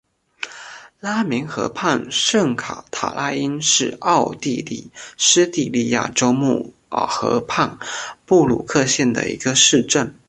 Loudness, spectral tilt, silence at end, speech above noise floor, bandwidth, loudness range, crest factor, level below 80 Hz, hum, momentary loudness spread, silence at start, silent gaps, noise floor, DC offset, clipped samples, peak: -18 LUFS; -3 dB/octave; 0.15 s; 20 dB; 11.5 kHz; 3 LU; 18 dB; -54 dBFS; none; 15 LU; 0.4 s; none; -39 dBFS; under 0.1%; under 0.1%; 0 dBFS